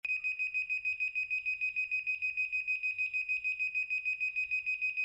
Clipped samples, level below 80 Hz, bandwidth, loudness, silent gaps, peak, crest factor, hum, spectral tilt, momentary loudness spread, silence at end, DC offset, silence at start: under 0.1%; -74 dBFS; 8 kHz; -32 LUFS; none; -26 dBFS; 8 dB; none; 0.5 dB/octave; 1 LU; 0 s; under 0.1%; 0.05 s